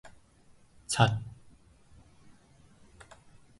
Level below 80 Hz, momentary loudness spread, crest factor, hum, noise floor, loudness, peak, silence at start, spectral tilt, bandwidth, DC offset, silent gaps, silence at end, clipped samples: -60 dBFS; 28 LU; 28 dB; none; -60 dBFS; -29 LUFS; -8 dBFS; 0.05 s; -4.5 dB/octave; 11.5 kHz; under 0.1%; none; 1.3 s; under 0.1%